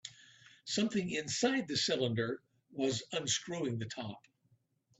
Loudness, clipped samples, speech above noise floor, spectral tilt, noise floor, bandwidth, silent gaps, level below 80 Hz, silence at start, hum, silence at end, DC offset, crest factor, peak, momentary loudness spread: -35 LUFS; under 0.1%; 39 dB; -3.5 dB/octave; -74 dBFS; 8.2 kHz; none; -74 dBFS; 0.05 s; none; 0.8 s; under 0.1%; 20 dB; -18 dBFS; 14 LU